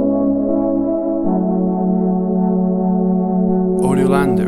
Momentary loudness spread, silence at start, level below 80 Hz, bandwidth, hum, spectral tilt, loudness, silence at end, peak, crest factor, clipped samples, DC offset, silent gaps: 3 LU; 0 s; -40 dBFS; 12 kHz; none; -9 dB/octave; -16 LUFS; 0 s; -2 dBFS; 14 dB; under 0.1%; under 0.1%; none